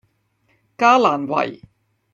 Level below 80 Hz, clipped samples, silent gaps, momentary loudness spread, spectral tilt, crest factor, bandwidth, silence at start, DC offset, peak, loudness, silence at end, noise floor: -66 dBFS; under 0.1%; none; 9 LU; -4.5 dB/octave; 18 dB; 7.6 kHz; 0.8 s; under 0.1%; -2 dBFS; -17 LUFS; 0.6 s; -64 dBFS